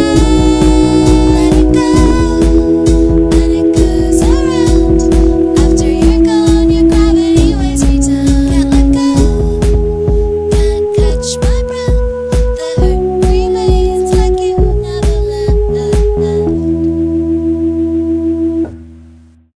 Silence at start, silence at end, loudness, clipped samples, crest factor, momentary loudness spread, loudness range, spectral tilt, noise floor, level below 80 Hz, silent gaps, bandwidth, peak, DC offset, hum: 0 s; 0.6 s; -11 LUFS; 0.5%; 10 dB; 5 LU; 4 LU; -7 dB/octave; -39 dBFS; -14 dBFS; none; 11 kHz; 0 dBFS; 0.4%; none